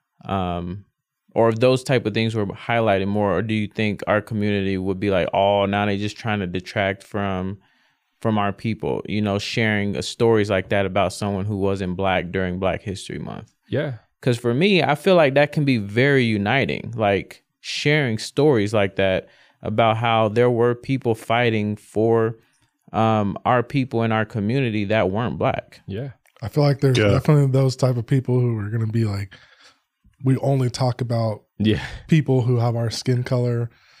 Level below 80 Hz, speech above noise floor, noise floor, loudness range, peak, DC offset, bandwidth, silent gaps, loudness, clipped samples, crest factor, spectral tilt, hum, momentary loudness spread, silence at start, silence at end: -52 dBFS; 42 dB; -63 dBFS; 5 LU; -6 dBFS; under 0.1%; 14 kHz; none; -21 LUFS; under 0.1%; 16 dB; -6.5 dB/octave; none; 10 LU; 0.25 s; 0.3 s